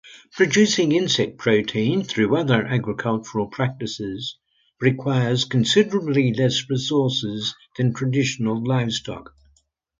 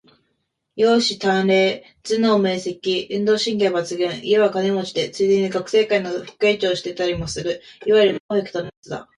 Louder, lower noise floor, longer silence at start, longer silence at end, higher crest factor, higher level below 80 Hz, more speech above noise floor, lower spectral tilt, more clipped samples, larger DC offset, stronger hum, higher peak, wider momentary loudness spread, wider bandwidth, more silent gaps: about the same, -21 LUFS vs -20 LUFS; second, -63 dBFS vs -72 dBFS; second, 0.05 s vs 0.75 s; first, 0.75 s vs 0.15 s; about the same, 18 dB vs 16 dB; second, -58 dBFS vs -52 dBFS; second, 42 dB vs 53 dB; about the same, -5 dB/octave vs -4.5 dB/octave; neither; neither; neither; about the same, -2 dBFS vs -4 dBFS; about the same, 11 LU vs 10 LU; second, 9.2 kHz vs 11 kHz; second, none vs 8.20-8.29 s, 8.77-8.83 s